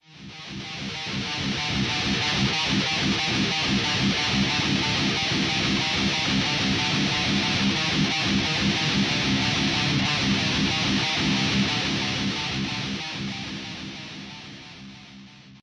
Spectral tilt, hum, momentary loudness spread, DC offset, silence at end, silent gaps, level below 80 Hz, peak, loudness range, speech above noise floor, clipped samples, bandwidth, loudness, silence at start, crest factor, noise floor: -3.5 dB/octave; none; 13 LU; under 0.1%; 0.05 s; none; -46 dBFS; -10 dBFS; 4 LU; 23 dB; under 0.1%; 10.5 kHz; -23 LUFS; 0.1 s; 14 dB; -46 dBFS